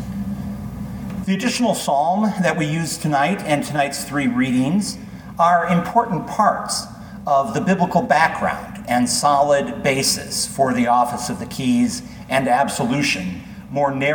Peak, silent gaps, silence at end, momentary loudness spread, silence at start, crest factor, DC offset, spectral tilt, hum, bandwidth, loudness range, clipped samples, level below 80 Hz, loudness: -2 dBFS; none; 0 s; 12 LU; 0 s; 18 dB; under 0.1%; -4.5 dB/octave; none; 19 kHz; 2 LU; under 0.1%; -46 dBFS; -19 LUFS